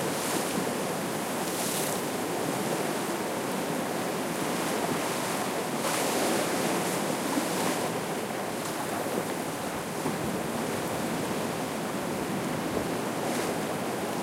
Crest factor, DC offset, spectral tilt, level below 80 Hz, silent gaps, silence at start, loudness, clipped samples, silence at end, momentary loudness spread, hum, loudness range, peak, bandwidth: 16 dB; under 0.1%; -3.5 dB/octave; -62 dBFS; none; 0 s; -30 LUFS; under 0.1%; 0 s; 4 LU; none; 3 LU; -14 dBFS; 16 kHz